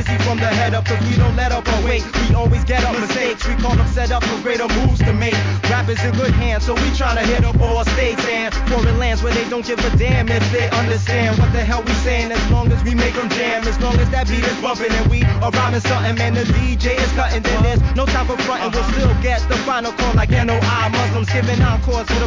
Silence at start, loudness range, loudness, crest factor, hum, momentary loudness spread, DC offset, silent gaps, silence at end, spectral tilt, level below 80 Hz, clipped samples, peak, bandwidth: 0 s; 1 LU; -17 LUFS; 14 dB; none; 3 LU; 0.2%; none; 0 s; -5.5 dB/octave; -20 dBFS; under 0.1%; -2 dBFS; 7.6 kHz